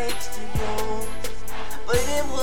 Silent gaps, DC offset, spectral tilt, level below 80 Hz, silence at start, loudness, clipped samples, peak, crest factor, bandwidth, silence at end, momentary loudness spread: none; 10%; -3.5 dB/octave; -36 dBFS; 0 s; -28 LUFS; under 0.1%; -8 dBFS; 18 dB; 18 kHz; 0 s; 11 LU